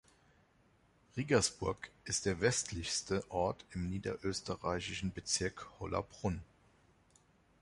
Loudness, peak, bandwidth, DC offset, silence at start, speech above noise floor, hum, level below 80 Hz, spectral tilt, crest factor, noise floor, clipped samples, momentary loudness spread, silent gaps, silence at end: -37 LUFS; -16 dBFS; 11.5 kHz; under 0.1%; 1.15 s; 33 dB; none; -56 dBFS; -3.5 dB/octave; 22 dB; -70 dBFS; under 0.1%; 9 LU; none; 1.15 s